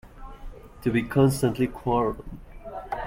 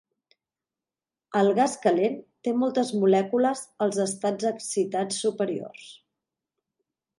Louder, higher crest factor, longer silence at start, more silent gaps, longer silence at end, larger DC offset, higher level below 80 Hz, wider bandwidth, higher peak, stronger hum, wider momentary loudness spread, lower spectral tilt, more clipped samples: about the same, -25 LUFS vs -25 LUFS; about the same, 18 dB vs 18 dB; second, 0.05 s vs 1.3 s; neither; second, 0 s vs 1.25 s; neither; first, -44 dBFS vs -78 dBFS; first, 16.5 kHz vs 11.5 kHz; about the same, -8 dBFS vs -8 dBFS; neither; first, 23 LU vs 8 LU; first, -7 dB/octave vs -5 dB/octave; neither